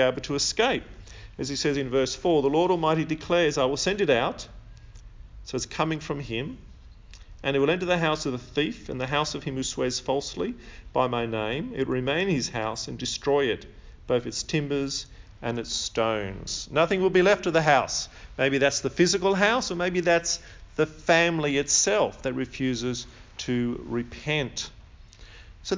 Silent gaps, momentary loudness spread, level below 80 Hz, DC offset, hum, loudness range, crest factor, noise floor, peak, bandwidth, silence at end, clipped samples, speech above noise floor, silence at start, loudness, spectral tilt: none; 12 LU; -48 dBFS; under 0.1%; none; 6 LU; 20 dB; -48 dBFS; -6 dBFS; 7.8 kHz; 0 s; under 0.1%; 22 dB; 0 s; -26 LUFS; -4 dB/octave